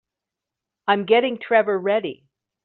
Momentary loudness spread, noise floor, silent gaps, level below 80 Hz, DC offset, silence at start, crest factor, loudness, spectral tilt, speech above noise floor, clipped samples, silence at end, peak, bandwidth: 9 LU; -86 dBFS; none; -72 dBFS; under 0.1%; 0.85 s; 18 dB; -20 LUFS; -2 dB/octave; 66 dB; under 0.1%; 0.5 s; -4 dBFS; 4.4 kHz